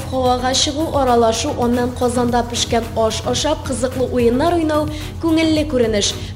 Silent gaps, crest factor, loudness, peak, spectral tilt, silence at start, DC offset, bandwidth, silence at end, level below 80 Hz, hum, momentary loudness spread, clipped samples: none; 14 dB; -17 LUFS; -2 dBFS; -4.5 dB/octave; 0 s; under 0.1%; 16 kHz; 0 s; -34 dBFS; none; 4 LU; under 0.1%